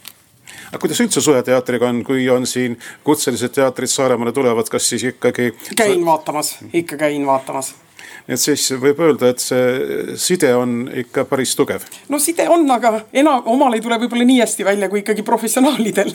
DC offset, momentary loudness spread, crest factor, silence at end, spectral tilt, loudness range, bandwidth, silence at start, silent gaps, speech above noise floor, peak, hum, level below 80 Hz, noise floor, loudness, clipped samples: under 0.1%; 8 LU; 14 dB; 0 s; -3.5 dB/octave; 3 LU; 20 kHz; 0.5 s; none; 26 dB; -2 dBFS; none; -66 dBFS; -42 dBFS; -16 LUFS; under 0.1%